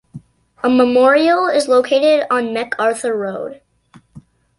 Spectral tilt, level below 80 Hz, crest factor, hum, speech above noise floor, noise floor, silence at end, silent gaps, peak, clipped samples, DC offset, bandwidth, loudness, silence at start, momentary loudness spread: -4 dB/octave; -60 dBFS; 14 dB; none; 35 dB; -49 dBFS; 0.4 s; none; -2 dBFS; under 0.1%; under 0.1%; 11.5 kHz; -15 LUFS; 0.15 s; 10 LU